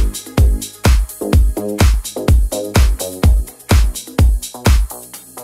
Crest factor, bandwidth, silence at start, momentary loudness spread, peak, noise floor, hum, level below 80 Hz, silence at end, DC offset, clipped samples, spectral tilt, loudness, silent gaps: 12 dB; 16 kHz; 0 s; 4 LU; -2 dBFS; -33 dBFS; none; -16 dBFS; 0 s; under 0.1%; under 0.1%; -5.5 dB/octave; -16 LUFS; none